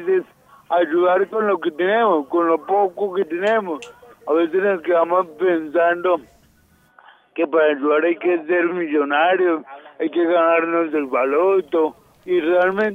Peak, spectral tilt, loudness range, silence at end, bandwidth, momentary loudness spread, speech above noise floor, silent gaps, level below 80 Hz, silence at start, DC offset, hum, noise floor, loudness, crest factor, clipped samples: -4 dBFS; -6.5 dB/octave; 2 LU; 0 s; 7.6 kHz; 6 LU; 38 dB; none; -68 dBFS; 0 s; under 0.1%; none; -56 dBFS; -19 LUFS; 14 dB; under 0.1%